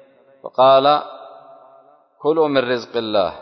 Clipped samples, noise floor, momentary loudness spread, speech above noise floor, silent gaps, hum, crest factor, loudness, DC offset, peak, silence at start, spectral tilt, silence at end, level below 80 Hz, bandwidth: under 0.1%; -50 dBFS; 21 LU; 34 dB; none; none; 16 dB; -17 LUFS; under 0.1%; -4 dBFS; 0.45 s; -6 dB/octave; 0 s; -60 dBFS; 6.2 kHz